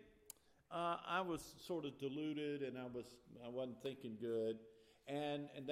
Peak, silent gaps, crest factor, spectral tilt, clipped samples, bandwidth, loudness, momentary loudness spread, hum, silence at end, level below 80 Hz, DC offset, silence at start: -28 dBFS; none; 18 dB; -5.5 dB/octave; under 0.1%; 15.5 kHz; -46 LUFS; 17 LU; none; 0 s; -78 dBFS; under 0.1%; 0 s